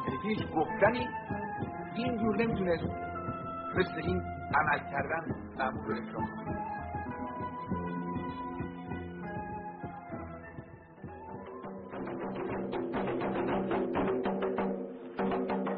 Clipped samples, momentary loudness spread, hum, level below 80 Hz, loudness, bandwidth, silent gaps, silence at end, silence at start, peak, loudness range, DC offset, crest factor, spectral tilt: under 0.1%; 13 LU; none; -56 dBFS; -34 LUFS; 4.6 kHz; none; 0 s; 0 s; -12 dBFS; 9 LU; under 0.1%; 22 dB; -5.5 dB/octave